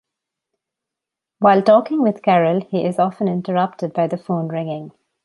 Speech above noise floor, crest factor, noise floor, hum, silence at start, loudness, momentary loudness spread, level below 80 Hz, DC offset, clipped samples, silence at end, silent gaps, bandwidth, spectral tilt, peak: 68 dB; 16 dB; -85 dBFS; none; 1.4 s; -18 LUFS; 10 LU; -66 dBFS; under 0.1%; under 0.1%; 0.35 s; none; 11.5 kHz; -8.5 dB/octave; -2 dBFS